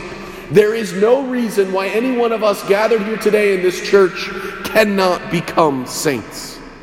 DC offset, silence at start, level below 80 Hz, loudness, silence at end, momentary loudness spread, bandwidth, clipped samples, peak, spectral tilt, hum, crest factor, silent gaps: under 0.1%; 0 s; -48 dBFS; -16 LUFS; 0 s; 11 LU; 16.5 kHz; under 0.1%; 0 dBFS; -4.5 dB/octave; none; 16 dB; none